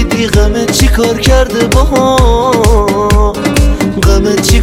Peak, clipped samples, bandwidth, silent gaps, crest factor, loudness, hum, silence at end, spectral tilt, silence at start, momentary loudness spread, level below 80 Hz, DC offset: 0 dBFS; 0.4%; 16 kHz; none; 8 dB; -9 LUFS; none; 0 s; -5 dB/octave; 0 s; 2 LU; -12 dBFS; under 0.1%